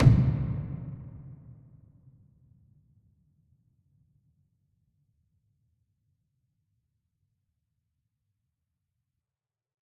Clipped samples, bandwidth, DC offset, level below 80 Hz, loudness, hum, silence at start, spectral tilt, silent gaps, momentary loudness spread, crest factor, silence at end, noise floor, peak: under 0.1%; 5.6 kHz; under 0.1%; -46 dBFS; -29 LUFS; none; 0 s; -10 dB/octave; none; 28 LU; 26 dB; 8.5 s; under -90 dBFS; -6 dBFS